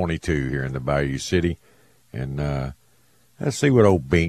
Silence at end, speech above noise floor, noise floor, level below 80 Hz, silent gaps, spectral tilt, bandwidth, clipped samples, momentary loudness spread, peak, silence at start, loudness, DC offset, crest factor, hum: 0 s; 39 dB; -61 dBFS; -38 dBFS; none; -6.5 dB/octave; 13.5 kHz; under 0.1%; 15 LU; -2 dBFS; 0 s; -22 LUFS; under 0.1%; 20 dB; none